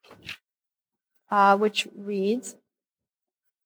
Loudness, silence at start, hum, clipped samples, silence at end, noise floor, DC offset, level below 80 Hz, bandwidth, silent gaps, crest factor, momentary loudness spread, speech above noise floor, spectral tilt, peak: -24 LUFS; 0.25 s; none; under 0.1%; 1.15 s; under -90 dBFS; under 0.1%; -78 dBFS; over 20 kHz; none; 20 dB; 21 LU; over 67 dB; -4.5 dB/octave; -8 dBFS